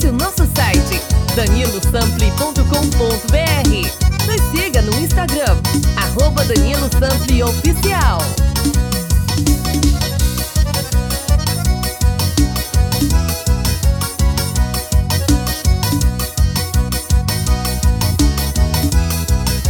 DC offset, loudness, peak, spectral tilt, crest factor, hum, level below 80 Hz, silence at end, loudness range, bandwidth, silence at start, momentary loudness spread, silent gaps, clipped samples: under 0.1%; -16 LUFS; 0 dBFS; -4.5 dB/octave; 14 dB; none; -18 dBFS; 0 s; 2 LU; over 20 kHz; 0 s; 3 LU; none; under 0.1%